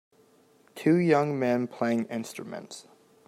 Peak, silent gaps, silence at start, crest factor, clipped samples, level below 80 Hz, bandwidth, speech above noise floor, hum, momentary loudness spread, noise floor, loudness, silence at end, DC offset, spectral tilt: -8 dBFS; none; 0.75 s; 20 dB; under 0.1%; -76 dBFS; 15.5 kHz; 35 dB; none; 18 LU; -61 dBFS; -27 LUFS; 0.45 s; under 0.1%; -7 dB/octave